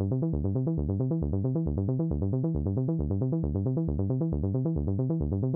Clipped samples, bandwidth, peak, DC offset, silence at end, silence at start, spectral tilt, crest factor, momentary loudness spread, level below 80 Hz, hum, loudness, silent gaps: under 0.1%; 1.6 kHz; -16 dBFS; under 0.1%; 0 s; 0 s; -14.5 dB/octave; 12 dB; 0 LU; -38 dBFS; none; -29 LUFS; none